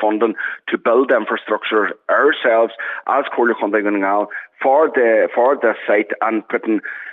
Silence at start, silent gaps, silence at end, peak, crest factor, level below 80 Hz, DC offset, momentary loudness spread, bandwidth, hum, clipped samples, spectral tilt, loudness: 0 s; none; 0 s; -2 dBFS; 14 dB; -82 dBFS; under 0.1%; 7 LU; 4 kHz; none; under 0.1%; -7 dB/octave; -17 LUFS